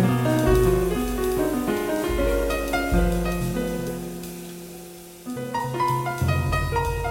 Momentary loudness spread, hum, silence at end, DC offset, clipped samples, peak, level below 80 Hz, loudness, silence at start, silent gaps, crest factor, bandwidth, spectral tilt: 15 LU; none; 0 s; under 0.1%; under 0.1%; -6 dBFS; -32 dBFS; -24 LUFS; 0 s; none; 18 dB; 16.5 kHz; -6 dB/octave